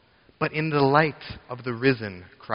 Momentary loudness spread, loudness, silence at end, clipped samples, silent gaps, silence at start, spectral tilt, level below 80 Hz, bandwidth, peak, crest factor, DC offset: 17 LU; -24 LUFS; 0 s; under 0.1%; none; 0.4 s; -5 dB/octave; -56 dBFS; 5.6 kHz; -4 dBFS; 22 dB; under 0.1%